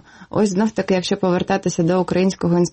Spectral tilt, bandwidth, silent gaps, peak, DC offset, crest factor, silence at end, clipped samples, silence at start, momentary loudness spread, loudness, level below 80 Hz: -6 dB/octave; 8.8 kHz; none; -8 dBFS; under 0.1%; 12 dB; 0.05 s; under 0.1%; 0.2 s; 2 LU; -19 LUFS; -50 dBFS